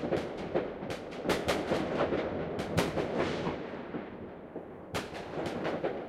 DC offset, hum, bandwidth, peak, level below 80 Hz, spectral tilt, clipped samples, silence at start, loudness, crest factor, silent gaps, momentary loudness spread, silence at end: under 0.1%; none; 16 kHz; -14 dBFS; -54 dBFS; -5.5 dB/octave; under 0.1%; 0 s; -34 LUFS; 20 dB; none; 11 LU; 0 s